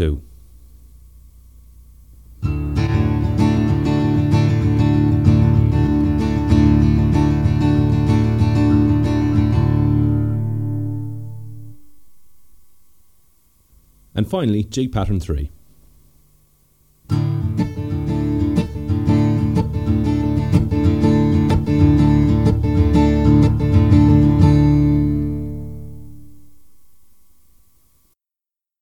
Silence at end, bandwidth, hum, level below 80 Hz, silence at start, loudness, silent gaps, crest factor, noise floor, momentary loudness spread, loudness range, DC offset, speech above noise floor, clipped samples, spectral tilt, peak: 2.55 s; 9.4 kHz; none; -28 dBFS; 0 s; -17 LUFS; none; 16 dB; -88 dBFS; 11 LU; 11 LU; 0.9%; 68 dB; under 0.1%; -9 dB/octave; 0 dBFS